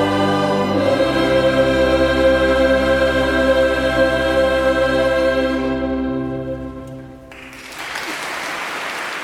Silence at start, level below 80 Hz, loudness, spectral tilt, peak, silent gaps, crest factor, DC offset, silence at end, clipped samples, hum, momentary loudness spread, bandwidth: 0 s; -34 dBFS; -17 LUFS; -5.5 dB/octave; -2 dBFS; none; 14 dB; under 0.1%; 0 s; under 0.1%; none; 15 LU; 15 kHz